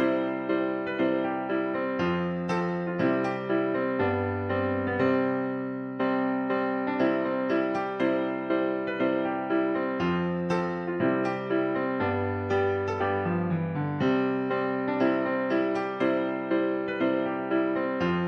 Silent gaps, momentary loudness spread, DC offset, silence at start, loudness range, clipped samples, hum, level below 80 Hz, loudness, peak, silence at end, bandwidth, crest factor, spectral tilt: none; 3 LU; under 0.1%; 0 s; 1 LU; under 0.1%; none; -64 dBFS; -28 LUFS; -12 dBFS; 0 s; 6.4 kHz; 14 dB; -8 dB/octave